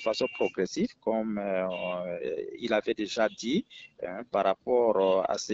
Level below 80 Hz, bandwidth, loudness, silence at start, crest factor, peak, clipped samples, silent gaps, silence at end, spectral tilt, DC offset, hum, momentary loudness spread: -66 dBFS; 8 kHz; -29 LUFS; 0 s; 18 dB; -12 dBFS; under 0.1%; none; 0 s; -3.5 dB/octave; under 0.1%; none; 10 LU